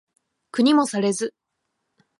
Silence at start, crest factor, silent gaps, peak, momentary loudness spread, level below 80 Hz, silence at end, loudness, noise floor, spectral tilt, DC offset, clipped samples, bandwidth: 0.55 s; 16 dB; none; -8 dBFS; 13 LU; -78 dBFS; 0.9 s; -21 LUFS; -77 dBFS; -4.5 dB/octave; under 0.1%; under 0.1%; 11.5 kHz